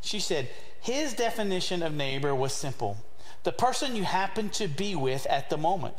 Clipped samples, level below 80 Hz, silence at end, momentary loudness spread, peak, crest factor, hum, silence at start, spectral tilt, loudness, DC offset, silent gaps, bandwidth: under 0.1%; -58 dBFS; 0 s; 7 LU; -12 dBFS; 18 dB; none; 0 s; -4 dB/octave; -30 LUFS; 3%; none; 16 kHz